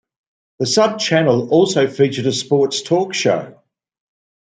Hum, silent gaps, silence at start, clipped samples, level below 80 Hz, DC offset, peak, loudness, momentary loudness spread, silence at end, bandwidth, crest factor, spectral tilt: none; none; 0.6 s; under 0.1%; -64 dBFS; under 0.1%; -2 dBFS; -16 LUFS; 4 LU; 1 s; 9.4 kHz; 16 dB; -4.5 dB/octave